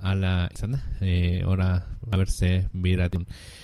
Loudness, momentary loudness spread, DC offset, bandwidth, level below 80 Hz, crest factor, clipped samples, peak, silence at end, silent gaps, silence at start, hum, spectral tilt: -26 LUFS; 6 LU; under 0.1%; 12 kHz; -34 dBFS; 14 dB; under 0.1%; -10 dBFS; 0 s; none; 0 s; none; -6.5 dB/octave